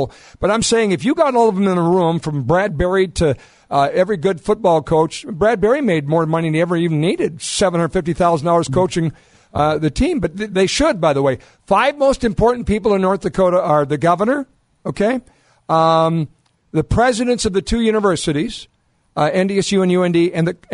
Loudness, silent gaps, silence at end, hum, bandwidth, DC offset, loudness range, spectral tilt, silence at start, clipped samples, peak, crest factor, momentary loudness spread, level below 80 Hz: -17 LUFS; none; 0 s; none; 11 kHz; under 0.1%; 2 LU; -5.5 dB/octave; 0 s; under 0.1%; -2 dBFS; 14 dB; 7 LU; -36 dBFS